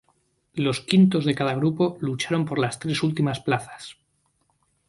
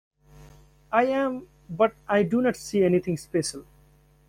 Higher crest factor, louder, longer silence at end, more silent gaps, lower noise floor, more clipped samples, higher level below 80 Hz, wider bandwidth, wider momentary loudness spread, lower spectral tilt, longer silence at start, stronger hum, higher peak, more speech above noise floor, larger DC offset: about the same, 22 dB vs 18 dB; about the same, -23 LUFS vs -25 LUFS; first, 0.95 s vs 0.7 s; neither; first, -69 dBFS vs -58 dBFS; neither; about the same, -62 dBFS vs -58 dBFS; second, 11.5 kHz vs 16 kHz; about the same, 13 LU vs 11 LU; about the same, -6 dB/octave vs -5.5 dB/octave; first, 0.55 s vs 0.4 s; neither; first, -2 dBFS vs -8 dBFS; first, 46 dB vs 34 dB; neither